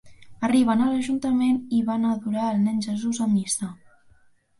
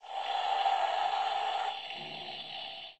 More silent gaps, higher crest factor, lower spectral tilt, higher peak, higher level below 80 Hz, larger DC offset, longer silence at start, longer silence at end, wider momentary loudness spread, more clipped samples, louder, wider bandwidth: neither; about the same, 14 dB vs 16 dB; first, -5 dB/octave vs -1.5 dB/octave; first, -10 dBFS vs -18 dBFS; first, -60 dBFS vs -80 dBFS; neither; about the same, 0.05 s vs 0 s; first, 0.85 s vs 0.05 s; second, 7 LU vs 10 LU; neither; first, -23 LUFS vs -33 LUFS; first, 11.5 kHz vs 9 kHz